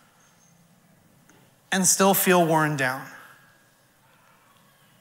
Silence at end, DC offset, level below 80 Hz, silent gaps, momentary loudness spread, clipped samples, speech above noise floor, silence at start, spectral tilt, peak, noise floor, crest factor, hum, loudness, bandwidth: 1.85 s; under 0.1%; -76 dBFS; none; 13 LU; under 0.1%; 39 dB; 1.7 s; -3.5 dB/octave; -6 dBFS; -60 dBFS; 22 dB; none; -21 LUFS; 16 kHz